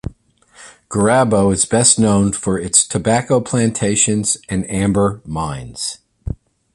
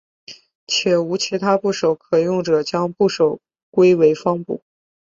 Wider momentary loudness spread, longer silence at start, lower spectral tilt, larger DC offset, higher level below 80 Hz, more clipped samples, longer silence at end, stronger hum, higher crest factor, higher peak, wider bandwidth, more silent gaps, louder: first, 14 LU vs 9 LU; second, 0.05 s vs 0.3 s; about the same, -4 dB/octave vs -5 dB/octave; neither; first, -38 dBFS vs -62 dBFS; neither; about the same, 0.4 s vs 0.5 s; neither; about the same, 16 dB vs 16 dB; about the same, 0 dBFS vs -2 dBFS; first, 11.5 kHz vs 7.8 kHz; second, none vs 0.55-0.67 s, 3.63-3.72 s; first, -15 LUFS vs -18 LUFS